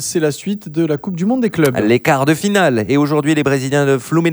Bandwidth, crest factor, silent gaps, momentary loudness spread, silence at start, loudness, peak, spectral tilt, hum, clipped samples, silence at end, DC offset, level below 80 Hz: over 20 kHz; 14 dB; none; 5 LU; 0 s; -15 LUFS; 0 dBFS; -5.5 dB/octave; none; under 0.1%; 0 s; under 0.1%; -54 dBFS